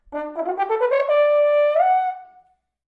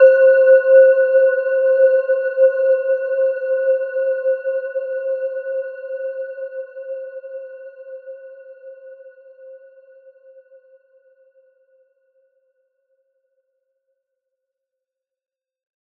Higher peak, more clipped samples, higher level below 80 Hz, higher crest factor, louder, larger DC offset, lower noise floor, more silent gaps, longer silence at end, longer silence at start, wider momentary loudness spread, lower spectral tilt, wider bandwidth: second, -8 dBFS vs -2 dBFS; neither; first, -64 dBFS vs under -90 dBFS; second, 12 dB vs 18 dB; second, -19 LUFS vs -16 LUFS; neither; second, -57 dBFS vs -85 dBFS; neither; second, 0.65 s vs 6.45 s; about the same, 0.1 s vs 0 s; second, 11 LU vs 25 LU; first, -4 dB/octave vs -2.5 dB/octave; first, 4.7 kHz vs 2.9 kHz